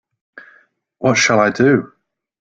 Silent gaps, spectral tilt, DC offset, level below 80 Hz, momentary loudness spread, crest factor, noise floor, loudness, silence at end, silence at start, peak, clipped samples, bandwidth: none; -4.5 dB/octave; under 0.1%; -56 dBFS; 6 LU; 16 dB; -54 dBFS; -14 LUFS; 0.55 s; 0.35 s; -2 dBFS; under 0.1%; 9.2 kHz